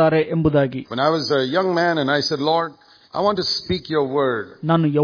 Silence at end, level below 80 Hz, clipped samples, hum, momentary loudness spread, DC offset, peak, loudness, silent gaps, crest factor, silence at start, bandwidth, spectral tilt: 0 s; -48 dBFS; under 0.1%; none; 4 LU; under 0.1%; -2 dBFS; -20 LUFS; none; 18 dB; 0 s; 5.4 kHz; -6 dB/octave